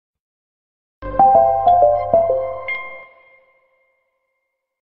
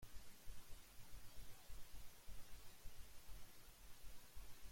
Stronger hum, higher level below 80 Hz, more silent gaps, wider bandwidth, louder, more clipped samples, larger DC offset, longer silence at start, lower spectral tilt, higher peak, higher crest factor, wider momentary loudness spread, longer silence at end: neither; first, -46 dBFS vs -62 dBFS; neither; second, 4.3 kHz vs 16.5 kHz; first, -15 LUFS vs -63 LUFS; neither; neither; first, 1 s vs 0 s; first, -8.5 dB/octave vs -3 dB/octave; first, -2 dBFS vs -40 dBFS; first, 18 dB vs 12 dB; first, 14 LU vs 1 LU; first, 1.8 s vs 0 s